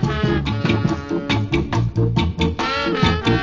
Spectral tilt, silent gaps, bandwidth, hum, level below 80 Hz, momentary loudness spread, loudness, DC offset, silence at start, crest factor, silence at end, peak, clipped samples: -6.5 dB/octave; none; 7.6 kHz; none; -30 dBFS; 3 LU; -20 LUFS; under 0.1%; 0 s; 16 dB; 0 s; -2 dBFS; under 0.1%